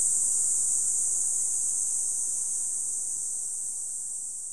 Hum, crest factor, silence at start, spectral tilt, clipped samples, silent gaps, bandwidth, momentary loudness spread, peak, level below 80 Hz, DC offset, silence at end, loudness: none; 18 dB; 0 s; 1.5 dB/octave; under 0.1%; none; 14 kHz; 8 LU; -10 dBFS; -70 dBFS; 0.7%; 0 s; -25 LUFS